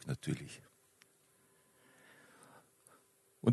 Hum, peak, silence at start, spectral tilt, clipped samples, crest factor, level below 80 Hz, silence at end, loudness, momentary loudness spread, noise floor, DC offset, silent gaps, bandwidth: none; -16 dBFS; 0.05 s; -7 dB/octave; under 0.1%; 26 dB; -72 dBFS; 0 s; -41 LUFS; 26 LU; -70 dBFS; under 0.1%; none; 12 kHz